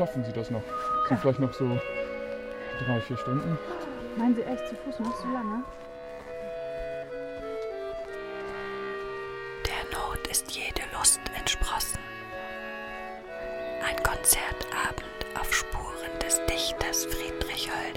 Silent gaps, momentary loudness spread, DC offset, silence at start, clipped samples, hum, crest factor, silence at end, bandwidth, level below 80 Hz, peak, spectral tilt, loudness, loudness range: none; 12 LU; under 0.1%; 0 s; under 0.1%; none; 24 dB; 0 s; 17 kHz; -44 dBFS; -8 dBFS; -3 dB/octave; -30 LUFS; 8 LU